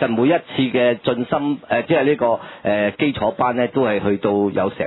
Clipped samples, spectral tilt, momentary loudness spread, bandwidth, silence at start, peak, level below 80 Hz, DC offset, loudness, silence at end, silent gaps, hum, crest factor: under 0.1%; -10 dB/octave; 4 LU; 4.1 kHz; 0 s; -2 dBFS; -54 dBFS; under 0.1%; -19 LUFS; 0 s; none; none; 16 dB